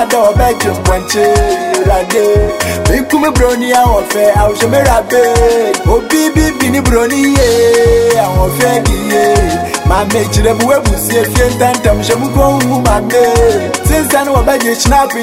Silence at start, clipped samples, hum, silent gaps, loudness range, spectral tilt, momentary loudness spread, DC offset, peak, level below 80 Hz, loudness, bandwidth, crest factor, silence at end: 0 s; under 0.1%; none; none; 1 LU; -5 dB/octave; 4 LU; under 0.1%; 0 dBFS; -18 dBFS; -10 LUFS; 16.5 kHz; 10 dB; 0 s